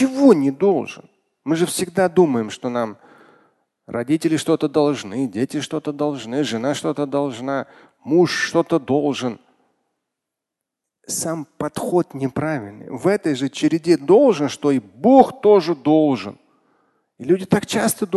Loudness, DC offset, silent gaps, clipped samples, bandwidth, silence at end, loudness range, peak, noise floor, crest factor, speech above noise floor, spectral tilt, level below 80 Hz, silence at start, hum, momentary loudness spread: -19 LUFS; under 0.1%; none; under 0.1%; 12.5 kHz; 0 s; 8 LU; 0 dBFS; -83 dBFS; 20 dB; 65 dB; -5.5 dB/octave; -60 dBFS; 0 s; none; 13 LU